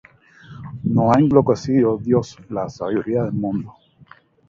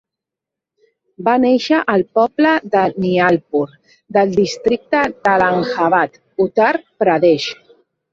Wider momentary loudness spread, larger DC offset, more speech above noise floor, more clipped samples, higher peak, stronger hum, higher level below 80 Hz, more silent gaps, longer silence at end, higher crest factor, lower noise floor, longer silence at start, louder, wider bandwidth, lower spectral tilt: first, 14 LU vs 6 LU; neither; second, 31 dB vs 69 dB; neither; about the same, 0 dBFS vs -2 dBFS; neither; first, -50 dBFS vs -56 dBFS; neither; first, 0.8 s vs 0.6 s; first, 20 dB vs 14 dB; second, -49 dBFS vs -85 dBFS; second, 0.5 s vs 1.2 s; second, -19 LUFS vs -16 LUFS; about the same, 7.6 kHz vs 7.8 kHz; first, -8.5 dB/octave vs -6 dB/octave